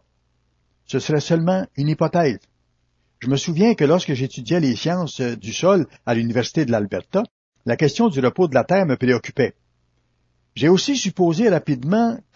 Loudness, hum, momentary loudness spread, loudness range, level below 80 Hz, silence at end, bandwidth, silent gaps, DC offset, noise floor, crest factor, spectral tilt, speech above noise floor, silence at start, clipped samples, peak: -20 LUFS; 60 Hz at -45 dBFS; 8 LU; 2 LU; -58 dBFS; 0.15 s; 7.8 kHz; 7.31-7.52 s; under 0.1%; -66 dBFS; 18 dB; -6 dB/octave; 47 dB; 0.9 s; under 0.1%; -2 dBFS